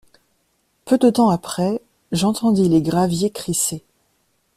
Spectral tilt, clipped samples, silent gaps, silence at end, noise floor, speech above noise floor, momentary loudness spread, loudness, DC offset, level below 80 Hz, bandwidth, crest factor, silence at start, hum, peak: -5.5 dB/octave; under 0.1%; none; 0.75 s; -66 dBFS; 48 dB; 8 LU; -19 LUFS; under 0.1%; -52 dBFS; 15 kHz; 16 dB; 0.85 s; none; -4 dBFS